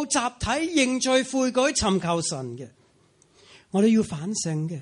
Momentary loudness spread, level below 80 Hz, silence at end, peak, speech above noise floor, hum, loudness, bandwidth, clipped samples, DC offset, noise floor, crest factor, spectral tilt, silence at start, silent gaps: 10 LU; -50 dBFS; 0 s; -8 dBFS; 37 dB; none; -24 LUFS; 11.5 kHz; under 0.1%; under 0.1%; -61 dBFS; 16 dB; -4 dB/octave; 0 s; none